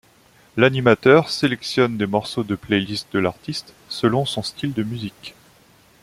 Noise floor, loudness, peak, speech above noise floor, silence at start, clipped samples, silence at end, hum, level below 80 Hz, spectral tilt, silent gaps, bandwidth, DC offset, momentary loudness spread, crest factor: -54 dBFS; -20 LUFS; -2 dBFS; 34 dB; 0.55 s; under 0.1%; 0.7 s; none; -56 dBFS; -5.5 dB/octave; none; 15.5 kHz; under 0.1%; 15 LU; 20 dB